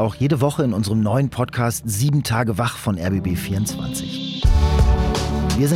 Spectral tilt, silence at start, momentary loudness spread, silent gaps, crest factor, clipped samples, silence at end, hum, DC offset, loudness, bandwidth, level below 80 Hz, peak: -6 dB/octave; 0 s; 6 LU; none; 14 dB; under 0.1%; 0 s; none; under 0.1%; -20 LUFS; 16.5 kHz; -24 dBFS; -6 dBFS